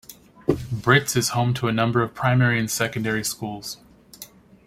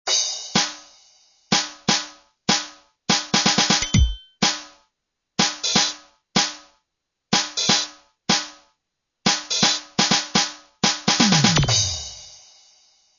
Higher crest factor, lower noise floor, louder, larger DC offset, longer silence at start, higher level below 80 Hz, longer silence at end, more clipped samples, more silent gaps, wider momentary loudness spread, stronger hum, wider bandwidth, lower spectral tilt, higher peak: about the same, 20 dB vs 22 dB; second, -46 dBFS vs -80 dBFS; about the same, -22 LUFS vs -20 LUFS; neither; about the same, 0.1 s vs 0.05 s; second, -52 dBFS vs -36 dBFS; second, 0.4 s vs 0.85 s; neither; neither; first, 21 LU vs 15 LU; neither; first, 16 kHz vs 7.6 kHz; first, -4.5 dB/octave vs -2.5 dB/octave; about the same, -2 dBFS vs -2 dBFS